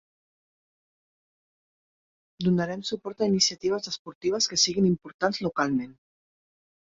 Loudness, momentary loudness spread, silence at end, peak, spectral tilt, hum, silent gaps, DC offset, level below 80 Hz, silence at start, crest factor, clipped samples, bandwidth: -26 LUFS; 9 LU; 0.9 s; -8 dBFS; -4 dB/octave; none; 3.99-4.05 s, 4.15-4.21 s, 5.14-5.19 s; under 0.1%; -64 dBFS; 2.4 s; 20 dB; under 0.1%; 7.8 kHz